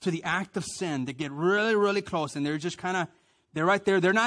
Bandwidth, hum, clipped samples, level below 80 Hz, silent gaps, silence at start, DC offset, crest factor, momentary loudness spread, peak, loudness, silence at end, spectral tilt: 10.5 kHz; none; under 0.1%; -66 dBFS; none; 0 s; under 0.1%; 16 dB; 9 LU; -12 dBFS; -28 LUFS; 0 s; -5 dB/octave